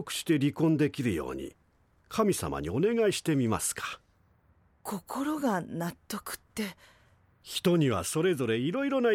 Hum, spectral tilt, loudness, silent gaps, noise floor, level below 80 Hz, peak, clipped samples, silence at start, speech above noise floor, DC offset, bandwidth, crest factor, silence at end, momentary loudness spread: none; -5 dB/octave; -30 LUFS; none; -66 dBFS; -58 dBFS; -14 dBFS; under 0.1%; 0 s; 37 dB; under 0.1%; 17 kHz; 16 dB; 0 s; 13 LU